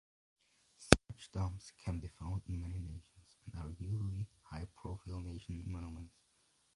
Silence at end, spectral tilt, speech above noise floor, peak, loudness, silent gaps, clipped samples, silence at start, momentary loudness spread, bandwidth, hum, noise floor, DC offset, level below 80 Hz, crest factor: 0.65 s; -5 dB/octave; 32 dB; 0 dBFS; -40 LUFS; none; under 0.1%; 0.8 s; 21 LU; 11.5 kHz; none; -75 dBFS; under 0.1%; -50 dBFS; 40 dB